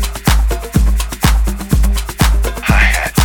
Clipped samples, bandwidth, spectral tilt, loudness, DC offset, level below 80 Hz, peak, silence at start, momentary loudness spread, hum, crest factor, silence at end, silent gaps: under 0.1%; 19 kHz; -4.5 dB/octave; -14 LUFS; under 0.1%; -14 dBFS; 0 dBFS; 0 s; 5 LU; none; 12 dB; 0 s; none